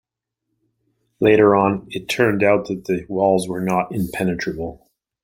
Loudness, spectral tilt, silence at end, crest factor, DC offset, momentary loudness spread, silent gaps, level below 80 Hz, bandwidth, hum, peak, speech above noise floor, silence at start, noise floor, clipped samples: -19 LUFS; -6 dB/octave; 0.5 s; 18 dB; under 0.1%; 12 LU; none; -52 dBFS; 16.5 kHz; none; 0 dBFS; 61 dB; 1.2 s; -79 dBFS; under 0.1%